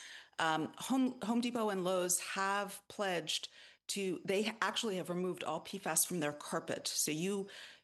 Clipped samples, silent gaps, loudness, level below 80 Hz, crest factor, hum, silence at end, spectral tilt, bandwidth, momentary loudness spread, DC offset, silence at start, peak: under 0.1%; none; -36 LUFS; -84 dBFS; 22 dB; none; 0.1 s; -3 dB/octave; 12.5 kHz; 8 LU; under 0.1%; 0 s; -14 dBFS